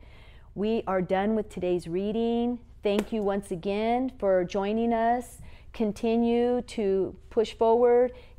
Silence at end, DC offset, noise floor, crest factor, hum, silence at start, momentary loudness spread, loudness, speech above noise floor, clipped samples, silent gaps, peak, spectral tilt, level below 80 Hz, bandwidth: 0.1 s; under 0.1%; -49 dBFS; 14 dB; none; 0.05 s; 8 LU; -27 LUFS; 22 dB; under 0.1%; none; -12 dBFS; -6.5 dB/octave; -50 dBFS; 14 kHz